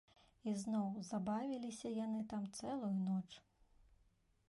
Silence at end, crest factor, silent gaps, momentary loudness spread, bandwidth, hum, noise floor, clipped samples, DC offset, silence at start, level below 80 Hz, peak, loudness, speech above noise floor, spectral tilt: 0.65 s; 12 dB; none; 5 LU; 11.5 kHz; none; -76 dBFS; under 0.1%; under 0.1%; 0.45 s; -76 dBFS; -30 dBFS; -43 LUFS; 34 dB; -6.5 dB/octave